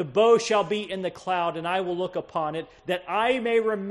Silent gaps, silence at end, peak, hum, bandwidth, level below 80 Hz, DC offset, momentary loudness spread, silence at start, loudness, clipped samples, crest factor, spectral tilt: none; 0 s; -8 dBFS; none; 11.5 kHz; -64 dBFS; under 0.1%; 11 LU; 0 s; -25 LUFS; under 0.1%; 16 dB; -4.5 dB/octave